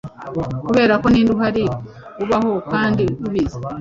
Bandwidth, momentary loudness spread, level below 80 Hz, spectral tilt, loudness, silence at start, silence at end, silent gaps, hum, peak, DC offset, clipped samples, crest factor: 7.6 kHz; 13 LU; -40 dBFS; -7.5 dB/octave; -18 LUFS; 0.05 s; 0 s; none; none; -2 dBFS; under 0.1%; under 0.1%; 16 dB